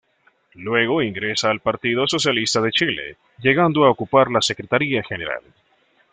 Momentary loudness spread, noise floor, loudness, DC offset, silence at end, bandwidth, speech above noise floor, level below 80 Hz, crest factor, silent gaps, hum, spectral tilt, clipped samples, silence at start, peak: 11 LU; -60 dBFS; -19 LUFS; under 0.1%; 0.7 s; 9.6 kHz; 40 dB; -58 dBFS; 18 dB; none; none; -4 dB/octave; under 0.1%; 0.55 s; -2 dBFS